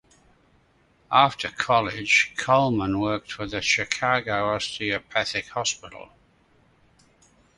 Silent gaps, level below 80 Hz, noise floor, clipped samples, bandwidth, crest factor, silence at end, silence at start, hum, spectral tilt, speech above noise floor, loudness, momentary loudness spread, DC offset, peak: none; -54 dBFS; -62 dBFS; under 0.1%; 11.5 kHz; 24 dB; 1.55 s; 1.1 s; none; -3.5 dB/octave; 38 dB; -23 LUFS; 9 LU; under 0.1%; -2 dBFS